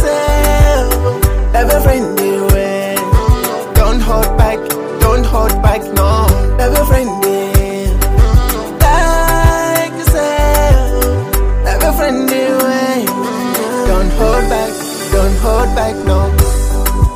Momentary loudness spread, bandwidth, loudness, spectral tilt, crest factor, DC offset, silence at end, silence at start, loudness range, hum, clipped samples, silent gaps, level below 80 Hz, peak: 4 LU; 16.5 kHz; -13 LUFS; -5.5 dB/octave; 10 dB; under 0.1%; 0 s; 0 s; 2 LU; none; under 0.1%; none; -14 dBFS; 0 dBFS